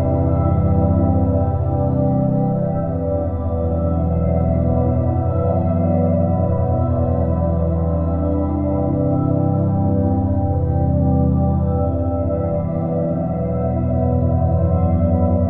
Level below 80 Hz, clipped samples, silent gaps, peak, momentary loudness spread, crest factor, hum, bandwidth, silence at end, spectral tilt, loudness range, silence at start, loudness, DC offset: -28 dBFS; under 0.1%; none; -4 dBFS; 4 LU; 12 dB; none; 2.7 kHz; 0 s; -14 dB/octave; 1 LU; 0 s; -18 LUFS; 0.3%